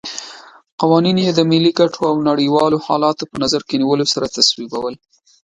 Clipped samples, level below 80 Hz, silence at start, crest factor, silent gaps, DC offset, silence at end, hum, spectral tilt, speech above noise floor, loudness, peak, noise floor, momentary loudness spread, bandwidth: under 0.1%; -56 dBFS; 0.05 s; 16 dB; 0.72-0.78 s; under 0.1%; 0.6 s; none; -5 dB/octave; 23 dB; -15 LUFS; 0 dBFS; -38 dBFS; 11 LU; 10.5 kHz